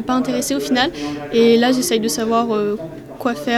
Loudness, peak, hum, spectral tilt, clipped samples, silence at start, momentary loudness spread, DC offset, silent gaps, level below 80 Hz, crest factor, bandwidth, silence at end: -18 LUFS; -2 dBFS; none; -3.5 dB/octave; under 0.1%; 0 s; 11 LU; under 0.1%; none; -50 dBFS; 16 dB; 16 kHz; 0 s